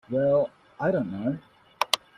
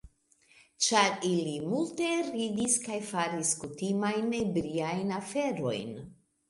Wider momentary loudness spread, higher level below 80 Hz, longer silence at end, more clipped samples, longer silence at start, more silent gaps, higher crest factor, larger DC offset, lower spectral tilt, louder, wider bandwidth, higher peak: about the same, 9 LU vs 7 LU; about the same, -64 dBFS vs -64 dBFS; second, 0.2 s vs 0.35 s; neither; about the same, 0.1 s vs 0.05 s; neither; about the same, 24 dB vs 22 dB; neither; about the same, -4.5 dB/octave vs -3.5 dB/octave; first, -27 LUFS vs -30 LUFS; first, 14.5 kHz vs 11.5 kHz; first, -2 dBFS vs -10 dBFS